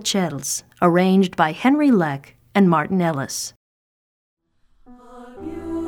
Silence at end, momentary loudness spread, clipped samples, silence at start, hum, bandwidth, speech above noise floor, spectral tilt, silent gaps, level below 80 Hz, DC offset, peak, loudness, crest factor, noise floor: 0 s; 16 LU; under 0.1%; 0 s; none; 18 kHz; 37 dB; -5 dB/octave; 3.56-4.37 s; -54 dBFS; under 0.1%; -2 dBFS; -19 LUFS; 18 dB; -56 dBFS